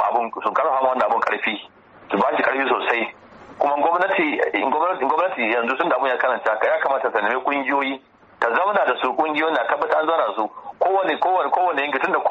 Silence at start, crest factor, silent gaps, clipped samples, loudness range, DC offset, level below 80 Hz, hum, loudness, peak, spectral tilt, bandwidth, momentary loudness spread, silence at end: 0 s; 14 dB; none; under 0.1%; 1 LU; under 0.1%; -68 dBFS; none; -20 LUFS; -6 dBFS; -5.5 dB/octave; 8 kHz; 5 LU; 0 s